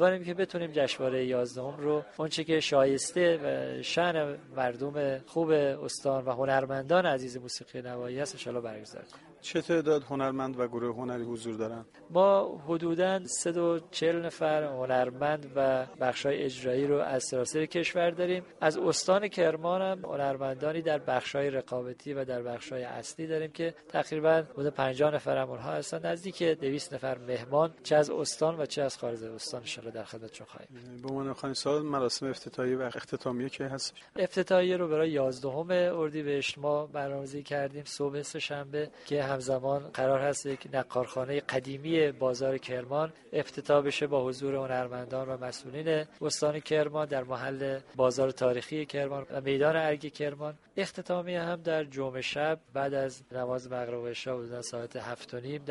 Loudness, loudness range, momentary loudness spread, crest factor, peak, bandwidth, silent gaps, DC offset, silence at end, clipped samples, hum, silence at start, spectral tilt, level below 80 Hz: -31 LUFS; 4 LU; 10 LU; 20 dB; -10 dBFS; 11.5 kHz; none; under 0.1%; 0 s; under 0.1%; none; 0 s; -4.5 dB/octave; -70 dBFS